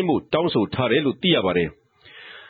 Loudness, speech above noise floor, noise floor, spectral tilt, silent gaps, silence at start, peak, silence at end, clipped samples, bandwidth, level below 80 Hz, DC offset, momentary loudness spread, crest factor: -21 LUFS; 25 dB; -46 dBFS; -9.5 dB/octave; none; 0 s; -6 dBFS; 0.05 s; under 0.1%; 4.9 kHz; -54 dBFS; under 0.1%; 6 LU; 16 dB